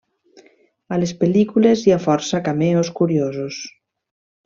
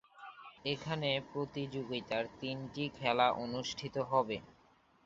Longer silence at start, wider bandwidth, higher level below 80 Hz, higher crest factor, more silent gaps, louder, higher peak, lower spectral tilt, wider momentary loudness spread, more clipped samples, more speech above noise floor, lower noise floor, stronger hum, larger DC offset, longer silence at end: first, 0.9 s vs 0.15 s; about the same, 7.6 kHz vs 8 kHz; first, -58 dBFS vs -68 dBFS; about the same, 18 dB vs 22 dB; neither; first, -18 LUFS vs -36 LUFS; first, -2 dBFS vs -14 dBFS; first, -6.5 dB/octave vs -3 dB/octave; about the same, 12 LU vs 11 LU; neither; first, 36 dB vs 31 dB; second, -53 dBFS vs -68 dBFS; neither; neither; first, 0.75 s vs 0.55 s